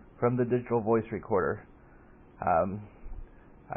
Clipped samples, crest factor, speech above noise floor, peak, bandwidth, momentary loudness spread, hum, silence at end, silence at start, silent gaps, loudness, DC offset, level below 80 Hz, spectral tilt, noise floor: under 0.1%; 18 dB; 26 dB; -14 dBFS; 3.5 kHz; 21 LU; none; 0 s; 0.15 s; none; -29 LUFS; under 0.1%; -52 dBFS; -12.5 dB/octave; -54 dBFS